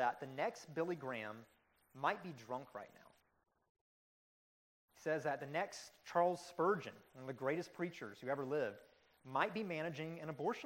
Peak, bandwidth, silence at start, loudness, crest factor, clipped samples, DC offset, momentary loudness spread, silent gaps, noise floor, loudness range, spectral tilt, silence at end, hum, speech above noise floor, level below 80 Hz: -20 dBFS; 16 kHz; 0 s; -42 LUFS; 24 dB; under 0.1%; under 0.1%; 14 LU; 3.69-3.75 s, 3.81-4.88 s; under -90 dBFS; 8 LU; -5.5 dB/octave; 0 s; none; over 48 dB; -86 dBFS